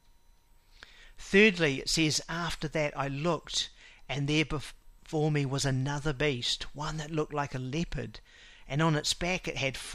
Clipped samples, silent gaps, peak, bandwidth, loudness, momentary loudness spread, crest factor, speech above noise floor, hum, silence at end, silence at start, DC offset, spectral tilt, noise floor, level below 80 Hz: under 0.1%; none; -10 dBFS; 14.5 kHz; -30 LUFS; 10 LU; 22 dB; 30 dB; none; 0 s; 1 s; under 0.1%; -4.5 dB/octave; -61 dBFS; -48 dBFS